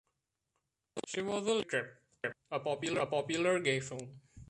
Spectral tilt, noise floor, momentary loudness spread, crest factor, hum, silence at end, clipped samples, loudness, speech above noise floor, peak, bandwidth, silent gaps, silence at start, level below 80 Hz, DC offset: -4 dB/octave; -85 dBFS; 15 LU; 18 dB; none; 0.05 s; under 0.1%; -35 LUFS; 50 dB; -18 dBFS; 11.5 kHz; none; 0.95 s; -70 dBFS; under 0.1%